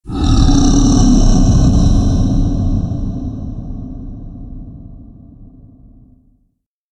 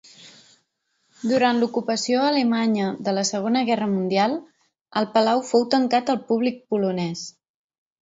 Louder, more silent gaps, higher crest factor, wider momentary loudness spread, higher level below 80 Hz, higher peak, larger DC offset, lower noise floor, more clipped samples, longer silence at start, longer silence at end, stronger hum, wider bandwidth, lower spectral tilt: first, -14 LUFS vs -22 LUFS; second, none vs 4.81-4.85 s; about the same, 14 dB vs 18 dB; first, 21 LU vs 8 LU; first, -16 dBFS vs -70 dBFS; first, 0 dBFS vs -4 dBFS; neither; second, -63 dBFS vs -71 dBFS; neither; second, 0.05 s vs 0.2 s; first, 1.5 s vs 0.7 s; neither; first, 9 kHz vs 7.8 kHz; first, -6.5 dB/octave vs -4.5 dB/octave